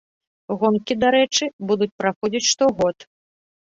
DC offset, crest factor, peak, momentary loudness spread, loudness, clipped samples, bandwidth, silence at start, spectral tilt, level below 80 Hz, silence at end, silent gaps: under 0.1%; 16 dB; -4 dBFS; 6 LU; -20 LUFS; under 0.1%; 7.8 kHz; 0.5 s; -3 dB/octave; -56 dBFS; 0.75 s; 1.53-1.59 s, 1.92-1.99 s, 2.16-2.21 s